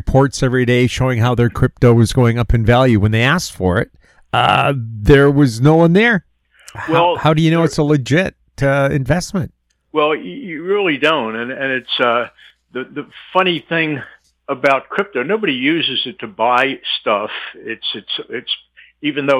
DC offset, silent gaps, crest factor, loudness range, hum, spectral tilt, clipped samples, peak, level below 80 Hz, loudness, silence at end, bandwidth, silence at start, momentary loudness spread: under 0.1%; none; 14 dB; 5 LU; none; -6 dB/octave; under 0.1%; 0 dBFS; -34 dBFS; -15 LUFS; 0 s; 13.5 kHz; 0.05 s; 12 LU